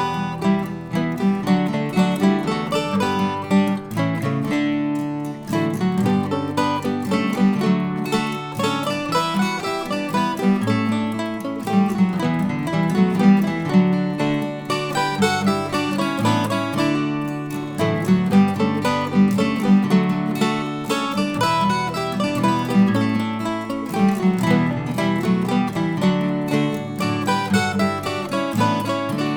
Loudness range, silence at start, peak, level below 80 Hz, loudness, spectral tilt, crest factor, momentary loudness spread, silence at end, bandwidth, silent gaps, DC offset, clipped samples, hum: 3 LU; 0 s; -4 dBFS; -54 dBFS; -20 LUFS; -6.5 dB/octave; 16 dB; 6 LU; 0 s; 18.5 kHz; none; under 0.1%; under 0.1%; none